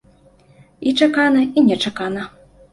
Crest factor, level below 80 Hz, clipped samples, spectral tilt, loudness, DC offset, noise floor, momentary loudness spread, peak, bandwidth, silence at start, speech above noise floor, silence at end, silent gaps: 16 dB; -56 dBFS; under 0.1%; -5 dB/octave; -17 LUFS; under 0.1%; -51 dBFS; 12 LU; -2 dBFS; 11.5 kHz; 0.8 s; 35 dB; 0.45 s; none